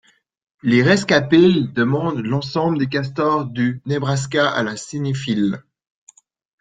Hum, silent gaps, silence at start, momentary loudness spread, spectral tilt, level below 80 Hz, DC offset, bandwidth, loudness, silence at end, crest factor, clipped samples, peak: none; none; 0.65 s; 9 LU; -6 dB/octave; -56 dBFS; under 0.1%; 9.4 kHz; -18 LUFS; 1 s; 18 dB; under 0.1%; -2 dBFS